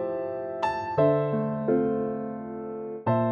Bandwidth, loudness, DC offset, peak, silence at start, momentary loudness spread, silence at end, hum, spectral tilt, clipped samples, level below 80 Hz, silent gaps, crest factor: 6.8 kHz; -28 LUFS; under 0.1%; -10 dBFS; 0 s; 12 LU; 0 s; none; -9 dB/octave; under 0.1%; -62 dBFS; none; 16 dB